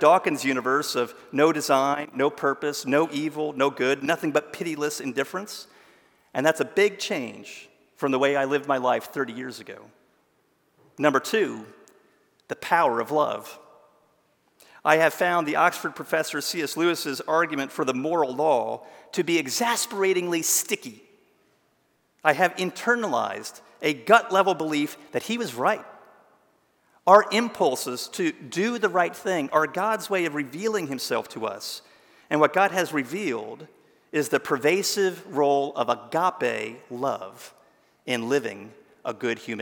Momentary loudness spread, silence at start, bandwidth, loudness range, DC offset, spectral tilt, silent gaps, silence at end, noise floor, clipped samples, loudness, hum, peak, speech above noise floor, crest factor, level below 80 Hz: 13 LU; 0 s; 18 kHz; 4 LU; under 0.1%; -3.5 dB/octave; none; 0 s; -68 dBFS; under 0.1%; -24 LUFS; none; -2 dBFS; 44 dB; 24 dB; -80 dBFS